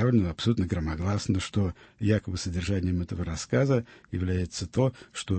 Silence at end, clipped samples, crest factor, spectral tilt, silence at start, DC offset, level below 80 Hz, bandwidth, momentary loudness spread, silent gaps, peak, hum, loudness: 0 s; under 0.1%; 16 dB; -6.5 dB/octave; 0 s; under 0.1%; -44 dBFS; 8.8 kHz; 8 LU; none; -10 dBFS; none; -29 LUFS